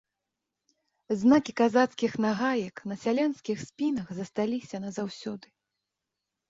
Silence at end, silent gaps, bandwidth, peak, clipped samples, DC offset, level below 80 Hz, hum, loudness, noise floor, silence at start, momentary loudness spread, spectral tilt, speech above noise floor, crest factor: 1.1 s; none; 7.8 kHz; -8 dBFS; under 0.1%; under 0.1%; -70 dBFS; none; -28 LUFS; -86 dBFS; 1.1 s; 13 LU; -5.5 dB/octave; 59 dB; 20 dB